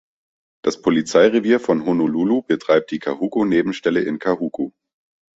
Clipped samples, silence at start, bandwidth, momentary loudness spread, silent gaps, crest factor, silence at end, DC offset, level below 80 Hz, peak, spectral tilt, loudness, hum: under 0.1%; 0.65 s; 8 kHz; 10 LU; none; 18 dB; 0.7 s; under 0.1%; -58 dBFS; -2 dBFS; -6 dB/octave; -19 LUFS; none